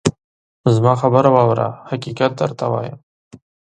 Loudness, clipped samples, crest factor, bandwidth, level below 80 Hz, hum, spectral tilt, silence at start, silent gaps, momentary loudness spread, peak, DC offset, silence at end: -17 LUFS; under 0.1%; 18 dB; 9.4 kHz; -52 dBFS; none; -7 dB/octave; 0.05 s; 0.24-0.64 s; 12 LU; 0 dBFS; under 0.1%; 0.8 s